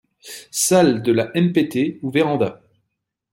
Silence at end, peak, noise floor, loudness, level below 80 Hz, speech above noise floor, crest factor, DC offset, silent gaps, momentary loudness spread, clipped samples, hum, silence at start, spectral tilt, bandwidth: 0.75 s; -2 dBFS; -77 dBFS; -19 LUFS; -62 dBFS; 60 dB; 16 dB; under 0.1%; none; 11 LU; under 0.1%; none; 0.25 s; -5 dB/octave; 16.5 kHz